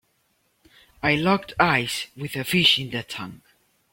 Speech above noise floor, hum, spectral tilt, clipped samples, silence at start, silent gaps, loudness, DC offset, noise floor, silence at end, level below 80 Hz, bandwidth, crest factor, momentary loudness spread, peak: 45 dB; none; -4 dB/octave; under 0.1%; 1.05 s; none; -22 LUFS; under 0.1%; -68 dBFS; 0.55 s; -56 dBFS; 16.5 kHz; 22 dB; 15 LU; -4 dBFS